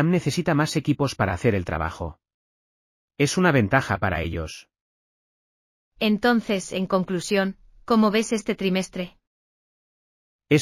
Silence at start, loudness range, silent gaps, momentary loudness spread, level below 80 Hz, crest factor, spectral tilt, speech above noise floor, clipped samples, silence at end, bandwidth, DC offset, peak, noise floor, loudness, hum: 0 s; 3 LU; 2.34-3.08 s, 4.81-5.91 s, 9.27-10.39 s; 13 LU; -46 dBFS; 20 dB; -5.5 dB/octave; over 67 dB; under 0.1%; 0 s; 15.5 kHz; under 0.1%; -4 dBFS; under -90 dBFS; -23 LUFS; none